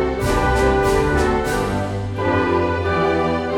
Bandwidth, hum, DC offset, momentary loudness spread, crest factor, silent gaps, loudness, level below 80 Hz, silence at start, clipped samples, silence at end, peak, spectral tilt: 17.5 kHz; none; under 0.1%; 5 LU; 14 dB; none; -19 LUFS; -28 dBFS; 0 s; under 0.1%; 0 s; -4 dBFS; -6 dB/octave